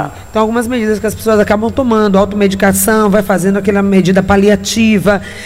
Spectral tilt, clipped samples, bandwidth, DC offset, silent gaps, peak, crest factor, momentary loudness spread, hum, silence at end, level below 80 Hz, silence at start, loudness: -5.5 dB/octave; 0.1%; 16.5 kHz; under 0.1%; none; 0 dBFS; 10 dB; 5 LU; none; 0 s; -34 dBFS; 0 s; -11 LUFS